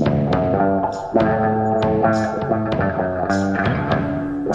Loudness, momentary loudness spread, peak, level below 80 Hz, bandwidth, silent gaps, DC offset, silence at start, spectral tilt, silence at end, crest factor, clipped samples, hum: -19 LUFS; 4 LU; -4 dBFS; -42 dBFS; 8.8 kHz; none; under 0.1%; 0 s; -7.5 dB/octave; 0 s; 14 dB; under 0.1%; none